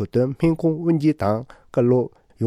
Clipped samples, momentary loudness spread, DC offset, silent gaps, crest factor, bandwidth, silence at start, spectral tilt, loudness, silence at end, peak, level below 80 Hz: under 0.1%; 8 LU; under 0.1%; none; 14 dB; 11 kHz; 0 s; -9.5 dB/octave; -21 LUFS; 0 s; -8 dBFS; -48 dBFS